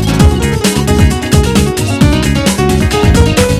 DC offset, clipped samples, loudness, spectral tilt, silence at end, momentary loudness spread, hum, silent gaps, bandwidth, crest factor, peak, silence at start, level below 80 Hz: under 0.1%; 2%; -10 LUFS; -5.5 dB/octave; 0 s; 3 LU; none; none; 14.5 kHz; 10 dB; 0 dBFS; 0 s; -16 dBFS